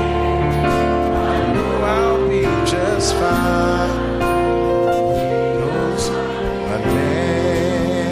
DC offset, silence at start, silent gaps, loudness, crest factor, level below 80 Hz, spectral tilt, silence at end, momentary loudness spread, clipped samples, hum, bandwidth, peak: under 0.1%; 0 s; none; -18 LUFS; 12 dB; -30 dBFS; -6 dB/octave; 0 s; 3 LU; under 0.1%; none; 15.5 kHz; -4 dBFS